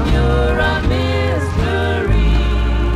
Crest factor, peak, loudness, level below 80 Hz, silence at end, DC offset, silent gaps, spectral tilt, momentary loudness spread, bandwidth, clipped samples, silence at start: 12 dB; -4 dBFS; -16 LUFS; -18 dBFS; 0 s; under 0.1%; none; -7 dB/octave; 3 LU; 10.5 kHz; under 0.1%; 0 s